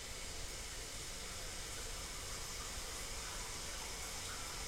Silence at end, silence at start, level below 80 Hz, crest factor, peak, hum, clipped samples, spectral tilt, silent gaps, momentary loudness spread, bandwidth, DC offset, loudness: 0 s; 0 s; -52 dBFS; 12 dB; -32 dBFS; none; under 0.1%; -1.5 dB/octave; none; 2 LU; 16 kHz; under 0.1%; -44 LUFS